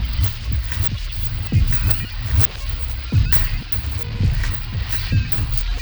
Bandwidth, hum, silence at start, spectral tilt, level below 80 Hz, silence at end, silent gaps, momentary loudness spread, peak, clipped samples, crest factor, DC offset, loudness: over 20 kHz; none; 0 s; -5.5 dB/octave; -24 dBFS; 0 s; none; 8 LU; -2 dBFS; under 0.1%; 18 dB; under 0.1%; -20 LUFS